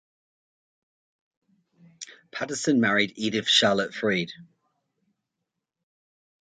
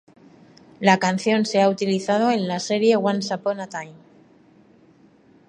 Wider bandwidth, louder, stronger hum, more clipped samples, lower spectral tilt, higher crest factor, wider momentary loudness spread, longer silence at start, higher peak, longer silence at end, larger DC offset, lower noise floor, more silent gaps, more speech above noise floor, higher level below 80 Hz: second, 9.4 kHz vs 11 kHz; about the same, -23 LUFS vs -21 LUFS; neither; neither; second, -3.5 dB/octave vs -5 dB/octave; about the same, 22 dB vs 22 dB; first, 21 LU vs 11 LU; first, 2 s vs 0.8 s; second, -6 dBFS vs 0 dBFS; first, 2 s vs 1.55 s; neither; first, -84 dBFS vs -54 dBFS; neither; first, 59 dB vs 33 dB; about the same, -70 dBFS vs -70 dBFS